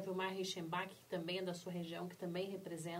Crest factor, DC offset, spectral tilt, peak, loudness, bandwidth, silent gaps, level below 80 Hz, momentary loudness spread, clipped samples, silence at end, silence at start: 16 dB; under 0.1%; -5 dB/octave; -26 dBFS; -44 LUFS; 16 kHz; none; -84 dBFS; 5 LU; under 0.1%; 0 s; 0 s